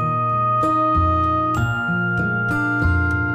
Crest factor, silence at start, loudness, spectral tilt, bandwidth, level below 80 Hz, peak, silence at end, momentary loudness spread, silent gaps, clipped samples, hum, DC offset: 12 dB; 0 s; -19 LUFS; -8 dB/octave; 15 kHz; -36 dBFS; -8 dBFS; 0 s; 3 LU; none; under 0.1%; none; under 0.1%